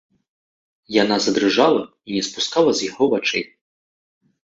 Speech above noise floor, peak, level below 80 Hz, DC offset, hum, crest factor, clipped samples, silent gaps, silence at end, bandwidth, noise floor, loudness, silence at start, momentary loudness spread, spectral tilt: over 71 dB; -2 dBFS; -62 dBFS; under 0.1%; none; 20 dB; under 0.1%; none; 1.15 s; 8 kHz; under -90 dBFS; -19 LUFS; 0.9 s; 9 LU; -3.5 dB/octave